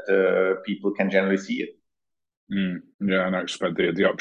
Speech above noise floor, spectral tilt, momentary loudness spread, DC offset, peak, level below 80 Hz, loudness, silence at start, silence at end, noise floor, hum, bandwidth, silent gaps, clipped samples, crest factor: 63 dB; -6 dB/octave; 9 LU; under 0.1%; -6 dBFS; -64 dBFS; -24 LUFS; 0 s; 0.05 s; -87 dBFS; none; 9.8 kHz; 2.37-2.47 s, 2.94-2.99 s; under 0.1%; 18 dB